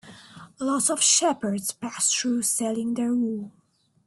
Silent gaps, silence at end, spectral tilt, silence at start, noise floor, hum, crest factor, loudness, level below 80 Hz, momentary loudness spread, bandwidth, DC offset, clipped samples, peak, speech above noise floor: none; 0.55 s; -2 dB/octave; 0.05 s; -47 dBFS; none; 18 dB; -23 LUFS; -70 dBFS; 12 LU; 12.5 kHz; under 0.1%; under 0.1%; -8 dBFS; 22 dB